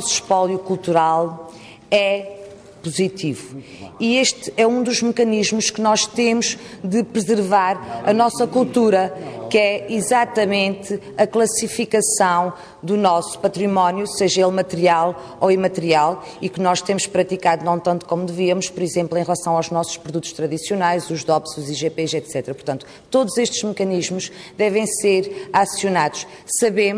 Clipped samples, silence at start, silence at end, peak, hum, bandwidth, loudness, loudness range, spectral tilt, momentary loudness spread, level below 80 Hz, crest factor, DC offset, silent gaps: under 0.1%; 0 s; 0 s; -4 dBFS; none; 11 kHz; -19 LUFS; 4 LU; -4 dB/octave; 10 LU; -60 dBFS; 16 dB; under 0.1%; none